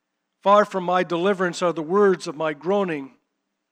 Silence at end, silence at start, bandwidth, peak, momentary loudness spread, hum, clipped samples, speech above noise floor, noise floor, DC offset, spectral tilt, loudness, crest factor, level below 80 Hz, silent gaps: 0.65 s; 0.45 s; 10.5 kHz; -2 dBFS; 9 LU; none; under 0.1%; 56 dB; -77 dBFS; under 0.1%; -5.5 dB/octave; -21 LUFS; 20 dB; -86 dBFS; none